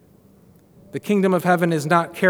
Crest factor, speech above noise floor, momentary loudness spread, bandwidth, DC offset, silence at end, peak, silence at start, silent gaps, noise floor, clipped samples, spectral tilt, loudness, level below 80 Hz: 18 dB; 33 dB; 12 LU; 19.5 kHz; under 0.1%; 0 s; -2 dBFS; 0.95 s; none; -52 dBFS; under 0.1%; -6.5 dB/octave; -19 LUFS; -66 dBFS